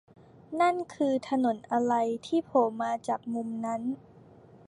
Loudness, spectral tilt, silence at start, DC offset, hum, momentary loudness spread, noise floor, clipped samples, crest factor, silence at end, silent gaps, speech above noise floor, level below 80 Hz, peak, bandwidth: -29 LUFS; -5.5 dB/octave; 0.5 s; under 0.1%; none; 7 LU; -54 dBFS; under 0.1%; 18 dB; 0.1 s; none; 25 dB; -72 dBFS; -12 dBFS; 11 kHz